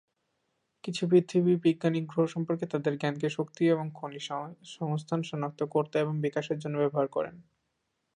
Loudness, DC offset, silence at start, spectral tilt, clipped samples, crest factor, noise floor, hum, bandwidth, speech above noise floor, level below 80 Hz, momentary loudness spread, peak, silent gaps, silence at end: -30 LUFS; under 0.1%; 0.85 s; -7 dB/octave; under 0.1%; 18 dB; -80 dBFS; none; 10.5 kHz; 51 dB; -76 dBFS; 12 LU; -12 dBFS; none; 0.75 s